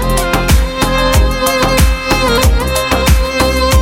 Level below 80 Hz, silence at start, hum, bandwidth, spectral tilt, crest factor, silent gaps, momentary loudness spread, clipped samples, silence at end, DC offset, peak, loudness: -14 dBFS; 0 s; none; 17 kHz; -4.5 dB/octave; 10 dB; none; 3 LU; under 0.1%; 0 s; under 0.1%; 0 dBFS; -12 LUFS